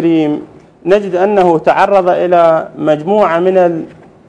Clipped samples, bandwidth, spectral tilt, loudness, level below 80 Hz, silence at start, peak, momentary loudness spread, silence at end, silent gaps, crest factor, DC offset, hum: 0.8%; 10 kHz; -7.5 dB/octave; -11 LUFS; -50 dBFS; 0 s; 0 dBFS; 9 LU; 0.4 s; none; 12 dB; under 0.1%; none